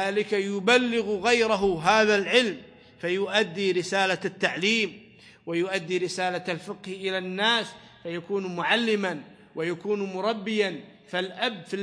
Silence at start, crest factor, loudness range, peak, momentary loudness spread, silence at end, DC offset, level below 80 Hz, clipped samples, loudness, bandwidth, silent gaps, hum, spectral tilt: 0 s; 20 dB; 5 LU; -6 dBFS; 13 LU; 0 s; under 0.1%; -64 dBFS; under 0.1%; -25 LUFS; 10.5 kHz; none; none; -4 dB/octave